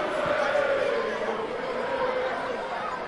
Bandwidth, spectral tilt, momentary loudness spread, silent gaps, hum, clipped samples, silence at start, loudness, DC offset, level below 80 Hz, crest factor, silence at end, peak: 11.5 kHz; -4.5 dB/octave; 6 LU; none; none; under 0.1%; 0 s; -27 LUFS; under 0.1%; -58 dBFS; 14 dB; 0 s; -14 dBFS